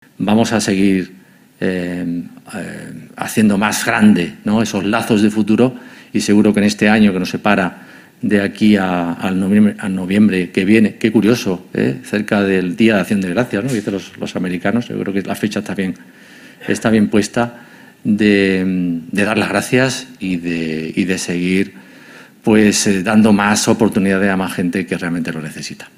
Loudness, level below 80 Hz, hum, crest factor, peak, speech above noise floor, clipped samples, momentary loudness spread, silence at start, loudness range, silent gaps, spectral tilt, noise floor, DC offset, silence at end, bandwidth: -15 LUFS; -50 dBFS; none; 16 dB; 0 dBFS; 25 dB; under 0.1%; 11 LU; 0.2 s; 5 LU; none; -5.5 dB/octave; -40 dBFS; under 0.1%; 0.1 s; 15.5 kHz